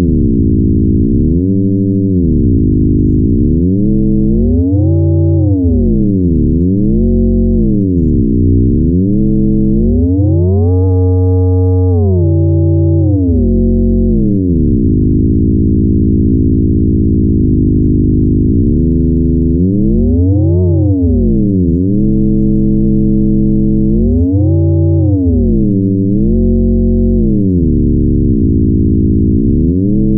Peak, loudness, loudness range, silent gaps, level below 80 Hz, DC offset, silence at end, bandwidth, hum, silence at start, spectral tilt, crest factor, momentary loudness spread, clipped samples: 0 dBFS; -11 LUFS; 0 LU; none; -18 dBFS; under 0.1%; 0 s; 1.2 kHz; none; 0 s; -18 dB/octave; 8 dB; 1 LU; under 0.1%